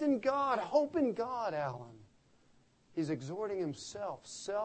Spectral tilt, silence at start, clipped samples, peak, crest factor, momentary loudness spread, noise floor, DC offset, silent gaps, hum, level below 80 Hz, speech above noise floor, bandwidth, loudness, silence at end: -5.5 dB/octave; 0 s; under 0.1%; -18 dBFS; 18 dB; 12 LU; -67 dBFS; under 0.1%; none; none; -74 dBFS; 32 dB; 8.4 kHz; -36 LUFS; 0 s